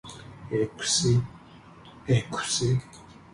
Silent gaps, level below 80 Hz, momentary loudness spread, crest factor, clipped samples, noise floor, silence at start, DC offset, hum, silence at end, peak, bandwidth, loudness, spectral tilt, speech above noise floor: none; -54 dBFS; 20 LU; 16 dB; under 0.1%; -49 dBFS; 0.05 s; under 0.1%; none; 0.2 s; -12 dBFS; 11.5 kHz; -26 LUFS; -4 dB/octave; 24 dB